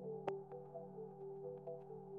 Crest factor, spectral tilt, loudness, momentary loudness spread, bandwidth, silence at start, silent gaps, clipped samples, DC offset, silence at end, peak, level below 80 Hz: 24 dB; -7.5 dB/octave; -50 LUFS; 6 LU; 4 kHz; 0 s; none; under 0.1%; under 0.1%; 0 s; -26 dBFS; -88 dBFS